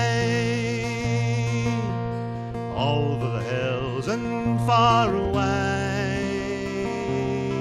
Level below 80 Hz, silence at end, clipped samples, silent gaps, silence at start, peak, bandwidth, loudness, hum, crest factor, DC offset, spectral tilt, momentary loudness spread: -44 dBFS; 0 s; under 0.1%; none; 0 s; -6 dBFS; 11.5 kHz; -24 LUFS; none; 18 dB; under 0.1%; -6 dB/octave; 8 LU